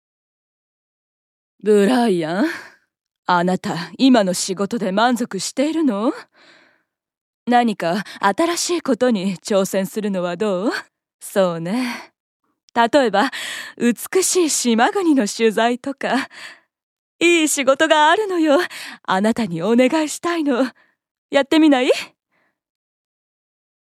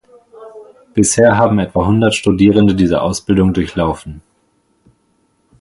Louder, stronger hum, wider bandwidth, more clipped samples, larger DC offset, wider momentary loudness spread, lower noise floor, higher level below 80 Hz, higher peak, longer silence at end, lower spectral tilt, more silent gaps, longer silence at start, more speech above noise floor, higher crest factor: second, -18 LUFS vs -13 LUFS; neither; first, 15.5 kHz vs 11.5 kHz; neither; neither; about the same, 11 LU vs 9 LU; first, -67 dBFS vs -60 dBFS; second, -72 dBFS vs -36 dBFS; about the same, 0 dBFS vs 0 dBFS; first, 1.9 s vs 1.4 s; second, -4 dB/octave vs -5.5 dB/octave; first, 3.18-3.23 s, 7.17-7.46 s, 11.14-11.19 s, 12.20-12.40 s, 12.63-12.68 s, 16.83-17.19 s, 21.11-21.29 s vs none; first, 1.65 s vs 0.4 s; about the same, 49 dB vs 47 dB; first, 20 dB vs 14 dB